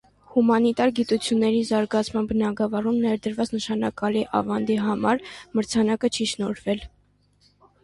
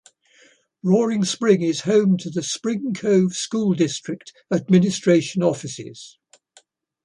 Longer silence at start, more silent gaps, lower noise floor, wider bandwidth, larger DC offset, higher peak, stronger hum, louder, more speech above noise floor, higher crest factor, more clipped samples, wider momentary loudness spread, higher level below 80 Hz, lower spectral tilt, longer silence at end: second, 0.3 s vs 0.85 s; neither; first, -62 dBFS vs -57 dBFS; about the same, 11.5 kHz vs 11 kHz; neither; about the same, -6 dBFS vs -4 dBFS; first, 50 Hz at -55 dBFS vs none; second, -24 LUFS vs -20 LUFS; about the same, 39 dB vs 37 dB; about the same, 16 dB vs 18 dB; neither; second, 6 LU vs 14 LU; first, -54 dBFS vs -64 dBFS; about the same, -5 dB/octave vs -5.5 dB/octave; about the same, 0.95 s vs 0.95 s